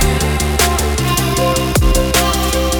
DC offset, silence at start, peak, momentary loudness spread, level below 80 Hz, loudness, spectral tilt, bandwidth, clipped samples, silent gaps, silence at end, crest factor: under 0.1%; 0 s; 0 dBFS; 2 LU; -18 dBFS; -14 LUFS; -4 dB/octave; over 20 kHz; under 0.1%; none; 0 s; 14 dB